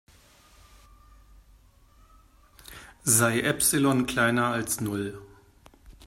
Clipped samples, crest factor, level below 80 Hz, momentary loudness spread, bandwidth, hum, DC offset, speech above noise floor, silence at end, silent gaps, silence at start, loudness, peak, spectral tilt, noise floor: under 0.1%; 22 dB; -56 dBFS; 25 LU; 16 kHz; none; under 0.1%; 32 dB; 0.15 s; none; 2.7 s; -24 LUFS; -6 dBFS; -3.5 dB/octave; -57 dBFS